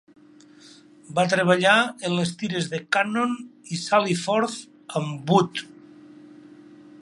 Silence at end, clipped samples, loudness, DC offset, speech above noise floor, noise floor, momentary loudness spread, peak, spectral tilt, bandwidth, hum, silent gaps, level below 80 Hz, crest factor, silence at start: 1.35 s; under 0.1%; -23 LUFS; under 0.1%; 28 dB; -51 dBFS; 13 LU; -4 dBFS; -4.5 dB/octave; 11.5 kHz; none; none; -70 dBFS; 22 dB; 0.65 s